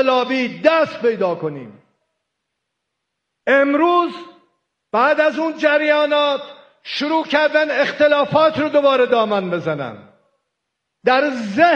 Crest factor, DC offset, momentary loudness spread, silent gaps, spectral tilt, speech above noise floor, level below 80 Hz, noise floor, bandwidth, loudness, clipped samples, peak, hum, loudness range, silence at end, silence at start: 18 dB; under 0.1%; 11 LU; none; -5.5 dB/octave; 61 dB; -66 dBFS; -77 dBFS; 7.8 kHz; -17 LUFS; under 0.1%; 0 dBFS; none; 5 LU; 0 s; 0 s